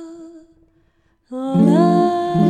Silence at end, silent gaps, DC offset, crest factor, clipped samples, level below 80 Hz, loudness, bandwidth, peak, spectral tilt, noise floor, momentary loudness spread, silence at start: 0 s; none; under 0.1%; 14 dB; under 0.1%; -56 dBFS; -15 LUFS; 9.4 kHz; -2 dBFS; -8.5 dB/octave; -60 dBFS; 20 LU; 0 s